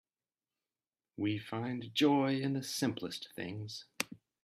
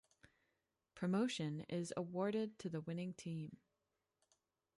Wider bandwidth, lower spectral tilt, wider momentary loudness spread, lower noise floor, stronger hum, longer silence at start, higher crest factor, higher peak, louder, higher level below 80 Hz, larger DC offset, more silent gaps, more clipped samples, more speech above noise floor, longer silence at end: first, 15.5 kHz vs 11.5 kHz; about the same, -5 dB/octave vs -6 dB/octave; first, 13 LU vs 9 LU; about the same, under -90 dBFS vs -89 dBFS; neither; first, 1.2 s vs 0.25 s; first, 24 dB vs 18 dB; first, -12 dBFS vs -28 dBFS; first, -35 LUFS vs -43 LUFS; about the same, -78 dBFS vs -82 dBFS; neither; neither; neither; first, over 55 dB vs 47 dB; second, 0.3 s vs 1.25 s